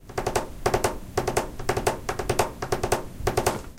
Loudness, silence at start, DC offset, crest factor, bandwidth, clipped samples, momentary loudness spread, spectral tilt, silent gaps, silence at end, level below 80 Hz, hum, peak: -27 LUFS; 0 s; under 0.1%; 22 dB; 17 kHz; under 0.1%; 4 LU; -4 dB/octave; none; 0 s; -38 dBFS; none; -6 dBFS